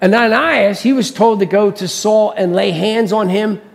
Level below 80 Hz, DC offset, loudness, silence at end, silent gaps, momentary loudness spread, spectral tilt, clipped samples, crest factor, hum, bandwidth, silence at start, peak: -58 dBFS; under 0.1%; -13 LUFS; 0.15 s; none; 4 LU; -5 dB/octave; under 0.1%; 14 dB; none; 14.5 kHz; 0 s; 0 dBFS